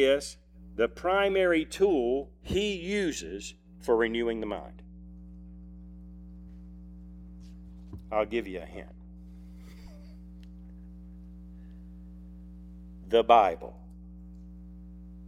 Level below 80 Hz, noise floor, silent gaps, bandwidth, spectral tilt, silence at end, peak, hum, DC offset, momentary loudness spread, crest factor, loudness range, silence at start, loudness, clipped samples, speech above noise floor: -48 dBFS; -47 dBFS; none; 15 kHz; -5 dB/octave; 0 s; -8 dBFS; none; under 0.1%; 23 LU; 24 dB; 20 LU; 0 s; -28 LUFS; under 0.1%; 20 dB